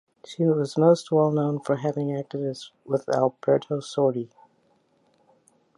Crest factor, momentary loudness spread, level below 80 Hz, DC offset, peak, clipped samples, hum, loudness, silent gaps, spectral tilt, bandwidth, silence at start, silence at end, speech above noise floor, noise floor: 20 dB; 12 LU; -74 dBFS; under 0.1%; -6 dBFS; under 0.1%; none; -24 LUFS; none; -7.5 dB/octave; 11.5 kHz; 0.3 s; 1.5 s; 41 dB; -65 dBFS